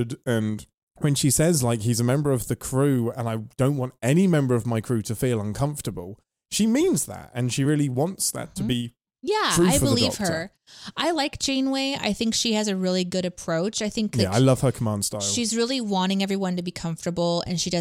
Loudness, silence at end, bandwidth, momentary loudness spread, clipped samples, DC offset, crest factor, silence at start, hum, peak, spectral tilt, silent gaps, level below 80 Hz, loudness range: -24 LUFS; 0 s; 16.5 kHz; 10 LU; under 0.1%; under 0.1%; 18 dB; 0 s; none; -6 dBFS; -4.5 dB/octave; 0.74-0.87 s; -48 dBFS; 2 LU